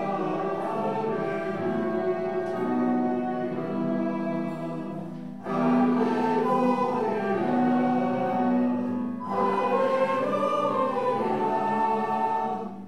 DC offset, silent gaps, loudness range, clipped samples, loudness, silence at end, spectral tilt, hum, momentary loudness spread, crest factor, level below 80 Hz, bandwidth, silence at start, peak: 0.4%; none; 3 LU; under 0.1%; -26 LUFS; 0 s; -8 dB/octave; none; 6 LU; 14 dB; -74 dBFS; 9.6 kHz; 0 s; -12 dBFS